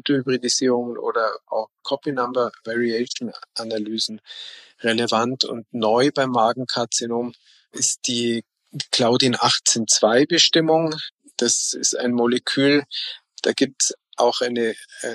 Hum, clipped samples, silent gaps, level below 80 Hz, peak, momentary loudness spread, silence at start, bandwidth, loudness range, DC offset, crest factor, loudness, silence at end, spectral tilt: none; under 0.1%; 11.12-11.18 s; -74 dBFS; -2 dBFS; 13 LU; 0.05 s; 12.5 kHz; 7 LU; under 0.1%; 20 dB; -20 LUFS; 0 s; -2.5 dB/octave